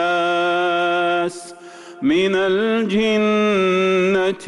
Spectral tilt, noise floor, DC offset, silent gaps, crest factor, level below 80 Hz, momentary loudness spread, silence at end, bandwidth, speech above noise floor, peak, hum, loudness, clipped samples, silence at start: -5.5 dB/octave; -38 dBFS; under 0.1%; none; 8 dB; -58 dBFS; 6 LU; 0 s; 11.5 kHz; 22 dB; -10 dBFS; none; -18 LUFS; under 0.1%; 0 s